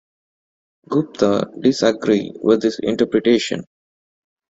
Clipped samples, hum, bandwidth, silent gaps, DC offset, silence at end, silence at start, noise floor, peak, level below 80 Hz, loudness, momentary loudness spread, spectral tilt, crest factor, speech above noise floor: under 0.1%; none; 8 kHz; none; under 0.1%; 0.95 s; 0.9 s; under -90 dBFS; -2 dBFS; -58 dBFS; -18 LUFS; 6 LU; -5.5 dB/octave; 18 dB; over 72 dB